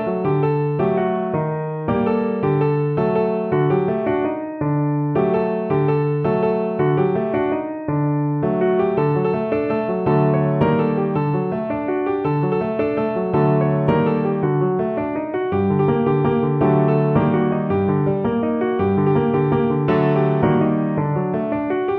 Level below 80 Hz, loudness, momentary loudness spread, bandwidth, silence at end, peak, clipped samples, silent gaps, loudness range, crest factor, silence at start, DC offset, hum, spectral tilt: -48 dBFS; -19 LUFS; 5 LU; 4.3 kHz; 0 s; -4 dBFS; under 0.1%; none; 2 LU; 14 dB; 0 s; under 0.1%; none; -11.5 dB/octave